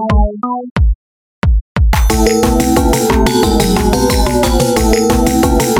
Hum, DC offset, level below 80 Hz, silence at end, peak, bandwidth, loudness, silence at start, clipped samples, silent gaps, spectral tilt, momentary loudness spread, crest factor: none; under 0.1%; -16 dBFS; 0 s; 0 dBFS; 17 kHz; -12 LUFS; 0 s; under 0.1%; 0.71-0.76 s, 0.95-1.42 s, 1.61-1.75 s; -5 dB/octave; 5 LU; 12 dB